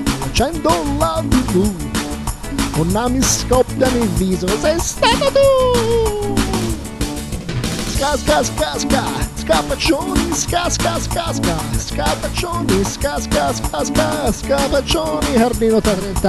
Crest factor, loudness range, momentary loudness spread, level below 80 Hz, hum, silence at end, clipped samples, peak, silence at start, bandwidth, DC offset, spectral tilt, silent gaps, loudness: 16 dB; 3 LU; 7 LU; -26 dBFS; none; 0 s; under 0.1%; 0 dBFS; 0 s; 14 kHz; under 0.1%; -4.5 dB/octave; none; -17 LUFS